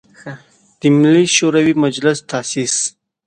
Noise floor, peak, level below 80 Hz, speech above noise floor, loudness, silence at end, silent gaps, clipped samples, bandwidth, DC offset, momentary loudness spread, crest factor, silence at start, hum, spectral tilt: -42 dBFS; 0 dBFS; -60 dBFS; 28 dB; -14 LUFS; 0.35 s; none; under 0.1%; 10 kHz; under 0.1%; 16 LU; 16 dB; 0.25 s; none; -4 dB/octave